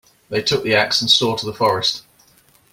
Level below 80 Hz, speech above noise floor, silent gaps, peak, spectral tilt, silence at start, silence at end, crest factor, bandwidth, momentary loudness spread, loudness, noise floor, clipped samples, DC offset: -56 dBFS; 36 dB; none; 0 dBFS; -3 dB/octave; 0.3 s; 0.75 s; 20 dB; 16.5 kHz; 8 LU; -17 LUFS; -54 dBFS; under 0.1%; under 0.1%